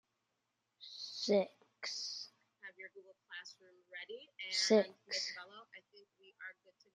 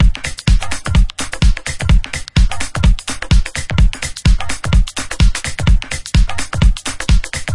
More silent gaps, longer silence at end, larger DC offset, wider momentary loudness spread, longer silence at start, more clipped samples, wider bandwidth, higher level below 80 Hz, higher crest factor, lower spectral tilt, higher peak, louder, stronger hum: neither; first, 0.45 s vs 0 s; second, under 0.1% vs 4%; first, 23 LU vs 3 LU; first, 0.8 s vs 0 s; neither; about the same, 11 kHz vs 11.5 kHz; second, under -90 dBFS vs -14 dBFS; first, 24 dB vs 12 dB; second, -3 dB/octave vs -4.5 dB/octave; second, -18 dBFS vs 0 dBFS; second, -37 LUFS vs -17 LUFS; neither